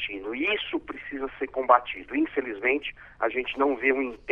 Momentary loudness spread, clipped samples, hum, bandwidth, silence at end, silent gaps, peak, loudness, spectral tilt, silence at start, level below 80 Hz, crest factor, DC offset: 12 LU; under 0.1%; none; 5.4 kHz; 0 s; none; -4 dBFS; -27 LUFS; -6 dB/octave; 0 s; -56 dBFS; 24 dB; under 0.1%